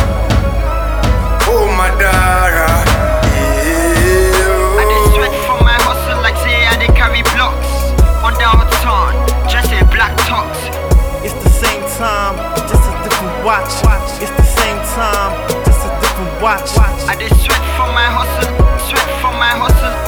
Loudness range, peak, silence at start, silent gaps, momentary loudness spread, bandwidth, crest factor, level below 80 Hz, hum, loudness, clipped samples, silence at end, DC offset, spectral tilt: 3 LU; 0 dBFS; 0 s; none; 6 LU; over 20 kHz; 10 dB; -14 dBFS; none; -12 LUFS; under 0.1%; 0 s; under 0.1%; -4.5 dB/octave